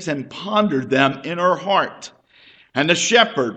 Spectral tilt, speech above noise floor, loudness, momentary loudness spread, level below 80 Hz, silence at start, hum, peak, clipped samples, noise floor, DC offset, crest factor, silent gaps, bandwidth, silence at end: -3.5 dB/octave; 32 dB; -18 LUFS; 13 LU; -62 dBFS; 0 s; none; 0 dBFS; under 0.1%; -51 dBFS; under 0.1%; 20 dB; none; 9.2 kHz; 0 s